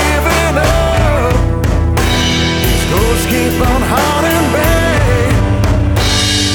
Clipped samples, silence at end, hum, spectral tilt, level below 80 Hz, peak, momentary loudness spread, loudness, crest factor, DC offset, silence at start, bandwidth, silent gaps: under 0.1%; 0 s; none; -4.5 dB/octave; -18 dBFS; 0 dBFS; 2 LU; -12 LUFS; 10 dB; under 0.1%; 0 s; over 20 kHz; none